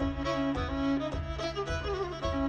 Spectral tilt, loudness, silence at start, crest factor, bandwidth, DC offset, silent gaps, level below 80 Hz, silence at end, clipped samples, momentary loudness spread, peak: -6.5 dB/octave; -33 LUFS; 0 s; 12 dB; 9 kHz; under 0.1%; none; -40 dBFS; 0 s; under 0.1%; 4 LU; -18 dBFS